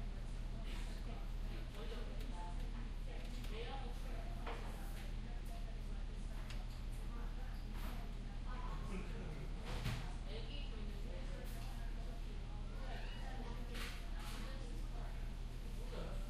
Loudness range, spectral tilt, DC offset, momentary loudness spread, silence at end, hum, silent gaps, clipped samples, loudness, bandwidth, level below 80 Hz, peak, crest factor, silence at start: 2 LU; -5.5 dB/octave; under 0.1%; 3 LU; 0 s; none; none; under 0.1%; -49 LUFS; 13.5 kHz; -44 dBFS; -30 dBFS; 14 dB; 0 s